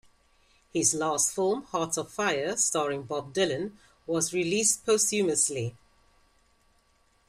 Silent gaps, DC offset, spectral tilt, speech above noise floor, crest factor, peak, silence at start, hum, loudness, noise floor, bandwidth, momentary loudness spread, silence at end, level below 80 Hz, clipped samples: none; under 0.1%; -2.5 dB/octave; 39 dB; 20 dB; -10 dBFS; 0.75 s; none; -27 LUFS; -66 dBFS; 15.5 kHz; 10 LU; 1.55 s; -66 dBFS; under 0.1%